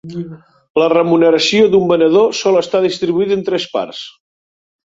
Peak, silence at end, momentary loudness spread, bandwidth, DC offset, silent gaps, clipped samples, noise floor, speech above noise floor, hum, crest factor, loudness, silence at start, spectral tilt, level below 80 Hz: 0 dBFS; 0.75 s; 16 LU; 7.8 kHz; under 0.1%; 0.70-0.75 s; under 0.1%; under -90 dBFS; over 77 dB; none; 14 dB; -13 LUFS; 0.05 s; -5 dB/octave; -56 dBFS